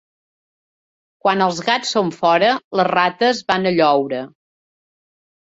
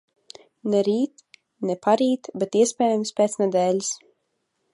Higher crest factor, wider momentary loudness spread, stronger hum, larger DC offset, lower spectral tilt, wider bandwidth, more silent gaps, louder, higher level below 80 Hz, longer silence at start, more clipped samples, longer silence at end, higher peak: about the same, 18 dB vs 18 dB; second, 6 LU vs 9 LU; neither; neither; about the same, -4.5 dB/octave vs -4.5 dB/octave; second, 8 kHz vs 11.5 kHz; first, 2.64-2.71 s vs none; first, -17 LUFS vs -23 LUFS; first, -62 dBFS vs -76 dBFS; first, 1.25 s vs 0.65 s; neither; first, 1.35 s vs 0.75 s; first, -2 dBFS vs -6 dBFS